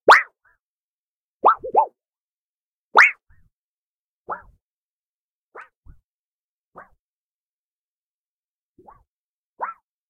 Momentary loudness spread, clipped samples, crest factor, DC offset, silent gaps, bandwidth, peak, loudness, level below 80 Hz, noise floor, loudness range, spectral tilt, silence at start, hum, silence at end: 21 LU; under 0.1%; 22 dB; under 0.1%; 0.60-1.40 s, 2.20-2.91 s, 3.53-4.25 s, 4.62-5.52 s, 5.76-5.83 s, 6.04-6.72 s, 6.99-8.75 s, 9.08-9.57 s; 15.5 kHz; -2 dBFS; -17 LUFS; -62 dBFS; under -90 dBFS; 22 LU; -1.5 dB/octave; 0.05 s; none; 0.4 s